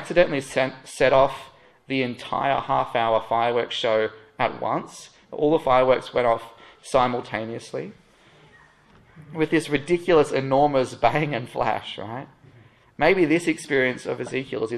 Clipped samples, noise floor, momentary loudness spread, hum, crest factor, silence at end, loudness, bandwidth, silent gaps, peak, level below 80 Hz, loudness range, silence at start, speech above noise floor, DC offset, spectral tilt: under 0.1%; -54 dBFS; 14 LU; none; 20 dB; 0 s; -23 LUFS; 12.5 kHz; none; -4 dBFS; -52 dBFS; 4 LU; 0 s; 32 dB; under 0.1%; -5.5 dB/octave